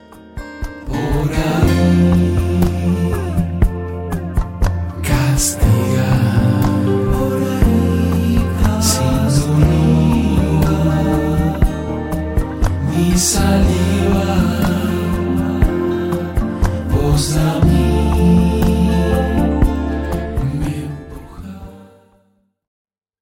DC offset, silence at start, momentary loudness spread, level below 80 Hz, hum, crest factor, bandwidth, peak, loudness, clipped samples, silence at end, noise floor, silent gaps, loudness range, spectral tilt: under 0.1%; 0.1 s; 9 LU; -22 dBFS; none; 12 dB; 16.5 kHz; -4 dBFS; -16 LUFS; under 0.1%; 1.4 s; -59 dBFS; none; 4 LU; -6 dB/octave